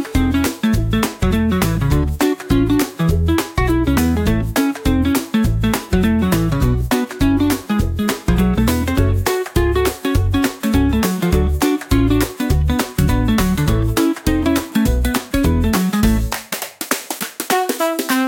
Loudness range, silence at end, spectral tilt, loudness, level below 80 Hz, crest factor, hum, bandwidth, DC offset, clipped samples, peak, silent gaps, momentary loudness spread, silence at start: 1 LU; 0 s; -5.5 dB/octave; -17 LUFS; -24 dBFS; 14 dB; none; 17.5 kHz; under 0.1%; under 0.1%; -2 dBFS; none; 3 LU; 0 s